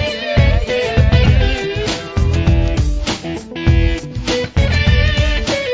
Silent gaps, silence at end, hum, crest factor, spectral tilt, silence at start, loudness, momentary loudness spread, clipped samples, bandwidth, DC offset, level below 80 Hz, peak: none; 0 s; none; 14 dB; -6 dB/octave; 0 s; -16 LUFS; 7 LU; under 0.1%; 8 kHz; under 0.1%; -18 dBFS; 0 dBFS